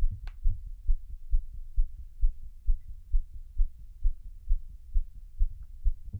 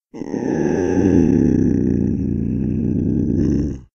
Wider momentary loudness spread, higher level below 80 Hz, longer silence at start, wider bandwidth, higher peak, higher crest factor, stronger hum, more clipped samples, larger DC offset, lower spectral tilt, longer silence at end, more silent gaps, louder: second, 3 LU vs 7 LU; about the same, -28 dBFS vs -32 dBFS; second, 0 s vs 0.15 s; second, 0.3 kHz vs 6.8 kHz; second, -14 dBFS vs -2 dBFS; about the same, 14 dB vs 14 dB; neither; neither; neither; about the same, -8 dB/octave vs -9 dB/octave; about the same, 0 s vs 0.1 s; neither; second, -38 LUFS vs -18 LUFS